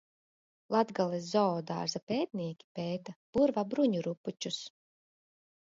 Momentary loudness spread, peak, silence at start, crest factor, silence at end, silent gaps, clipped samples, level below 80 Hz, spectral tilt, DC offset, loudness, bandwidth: 10 LU; -14 dBFS; 0.7 s; 20 dB; 1.05 s; 2.03-2.07 s, 2.64-2.75 s, 3.16-3.33 s, 4.17-4.24 s; under 0.1%; -72 dBFS; -5.5 dB/octave; under 0.1%; -33 LUFS; 8 kHz